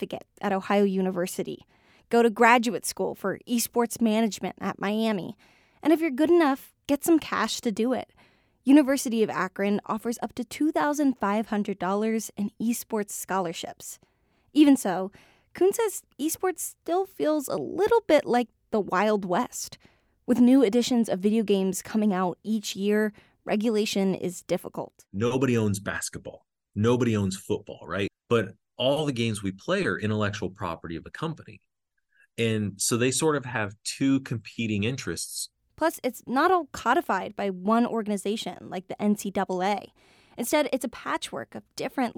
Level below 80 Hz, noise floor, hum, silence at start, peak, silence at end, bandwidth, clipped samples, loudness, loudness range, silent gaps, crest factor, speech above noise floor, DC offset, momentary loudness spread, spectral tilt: -64 dBFS; -73 dBFS; none; 0 s; -6 dBFS; 0.05 s; over 20 kHz; under 0.1%; -26 LUFS; 5 LU; none; 20 dB; 48 dB; under 0.1%; 13 LU; -5 dB/octave